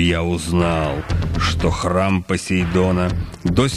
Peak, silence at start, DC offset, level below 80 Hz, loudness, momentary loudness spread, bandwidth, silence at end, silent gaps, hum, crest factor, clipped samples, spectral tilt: -2 dBFS; 0 s; under 0.1%; -30 dBFS; -19 LUFS; 5 LU; 13 kHz; 0 s; none; none; 16 dB; under 0.1%; -6 dB/octave